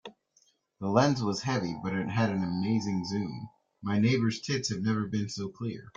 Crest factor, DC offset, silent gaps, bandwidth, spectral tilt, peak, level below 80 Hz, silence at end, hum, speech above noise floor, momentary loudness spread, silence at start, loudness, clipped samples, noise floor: 22 dB; under 0.1%; none; 9 kHz; -6 dB/octave; -8 dBFS; -64 dBFS; 0.1 s; none; 40 dB; 12 LU; 0.05 s; -30 LUFS; under 0.1%; -69 dBFS